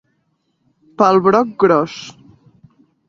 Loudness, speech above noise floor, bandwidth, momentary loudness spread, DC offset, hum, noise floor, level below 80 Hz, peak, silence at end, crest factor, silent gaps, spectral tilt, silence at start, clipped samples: -14 LUFS; 52 dB; 7.4 kHz; 18 LU; under 0.1%; none; -66 dBFS; -60 dBFS; 0 dBFS; 1 s; 18 dB; none; -6.5 dB/octave; 1 s; under 0.1%